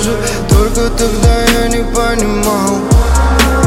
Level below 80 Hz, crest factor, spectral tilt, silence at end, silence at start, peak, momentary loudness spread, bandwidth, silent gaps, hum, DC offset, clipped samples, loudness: -14 dBFS; 10 dB; -5 dB/octave; 0 s; 0 s; 0 dBFS; 4 LU; 16.5 kHz; none; none; under 0.1%; under 0.1%; -12 LUFS